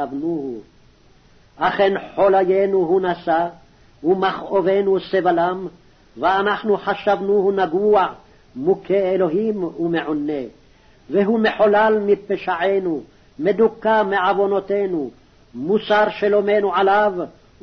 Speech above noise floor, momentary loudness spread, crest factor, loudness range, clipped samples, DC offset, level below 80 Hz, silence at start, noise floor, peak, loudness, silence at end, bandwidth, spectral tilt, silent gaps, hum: 33 dB; 10 LU; 14 dB; 2 LU; under 0.1%; under 0.1%; -54 dBFS; 0 s; -51 dBFS; -6 dBFS; -19 LUFS; 0.3 s; 6.2 kHz; -7.5 dB/octave; none; none